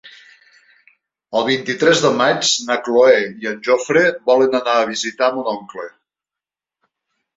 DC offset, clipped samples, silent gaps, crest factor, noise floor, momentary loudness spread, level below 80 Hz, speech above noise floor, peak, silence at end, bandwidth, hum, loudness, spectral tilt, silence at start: under 0.1%; under 0.1%; none; 16 dB; -88 dBFS; 11 LU; -64 dBFS; 72 dB; -2 dBFS; 1.45 s; 8 kHz; none; -16 LUFS; -3 dB/octave; 0.05 s